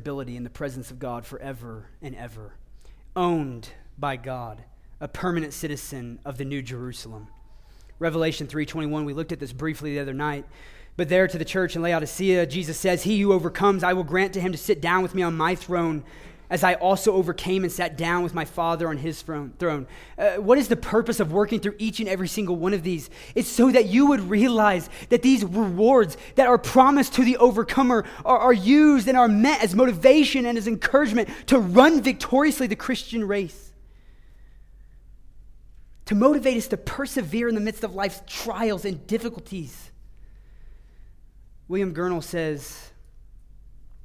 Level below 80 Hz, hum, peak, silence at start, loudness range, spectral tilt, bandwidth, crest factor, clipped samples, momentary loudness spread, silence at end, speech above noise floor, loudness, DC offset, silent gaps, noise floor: -48 dBFS; none; -2 dBFS; 0 s; 13 LU; -5.5 dB/octave; 16 kHz; 22 dB; under 0.1%; 17 LU; 0.05 s; 26 dB; -22 LUFS; under 0.1%; none; -48 dBFS